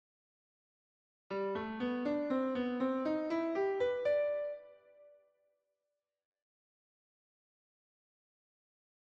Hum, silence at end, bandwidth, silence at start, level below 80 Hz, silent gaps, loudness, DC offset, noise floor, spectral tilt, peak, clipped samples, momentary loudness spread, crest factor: none; 3.95 s; 7.4 kHz; 1.3 s; -76 dBFS; none; -36 LUFS; under 0.1%; -89 dBFS; -7 dB/octave; -24 dBFS; under 0.1%; 7 LU; 16 dB